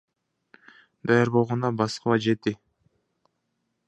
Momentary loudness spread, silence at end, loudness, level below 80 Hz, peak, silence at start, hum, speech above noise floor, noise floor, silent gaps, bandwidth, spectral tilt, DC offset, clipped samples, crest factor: 11 LU; 1.35 s; -24 LUFS; -64 dBFS; -6 dBFS; 1.05 s; none; 54 dB; -77 dBFS; none; 10.5 kHz; -6.5 dB/octave; under 0.1%; under 0.1%; 20 dB